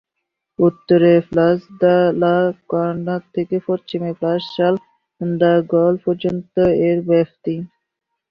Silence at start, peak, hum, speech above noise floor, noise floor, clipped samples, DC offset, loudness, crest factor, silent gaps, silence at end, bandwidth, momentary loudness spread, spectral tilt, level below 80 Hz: 0.6 s; -2 dBFS; none; 62 dB; -78 dBFS; under 0.1%; under 0.1%; -17 LUFS; 14 dB; none; 0.65 s; 5.4 kHz; 10 LU; -9.5 dB/octave; -54 dBFS